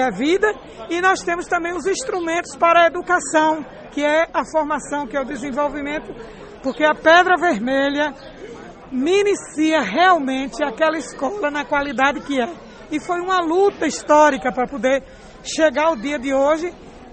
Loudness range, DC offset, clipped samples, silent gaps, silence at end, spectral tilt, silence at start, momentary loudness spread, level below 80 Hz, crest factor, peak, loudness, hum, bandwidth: 3 LU; under 0.1%; under 0.1%; none; 0.05 s; -3.5 dB/octave; 0 s; 14 LU; -48 dBFS; 18 dB; -2 dBFS; -19 LUFS; none; 8.8 kHz